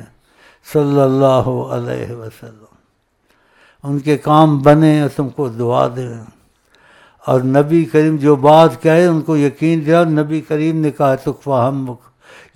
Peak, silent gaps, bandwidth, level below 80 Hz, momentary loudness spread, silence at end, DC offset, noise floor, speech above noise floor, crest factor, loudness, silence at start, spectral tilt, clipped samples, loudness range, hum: 0 dBFS; none; 14 kHz; -48 dBFS; 16 LU; 0.6 s; under 0.1%; -61 dBFS; 48 dB; 14 dB; -14 LUFS; 0 s; -8 dB/octave; under 0.1%; 6 LU; none